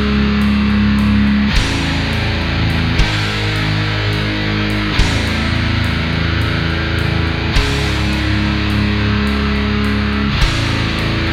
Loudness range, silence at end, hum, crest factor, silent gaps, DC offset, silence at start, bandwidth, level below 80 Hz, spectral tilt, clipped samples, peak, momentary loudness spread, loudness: 1 LU; 0 s; none; 14 dB; none; under 0.1%; 0 s; 15 kHz; -22 dBFS; -6 dB/octave; under 0.1%; 0 dBFS; 3 LU; -15 LUFS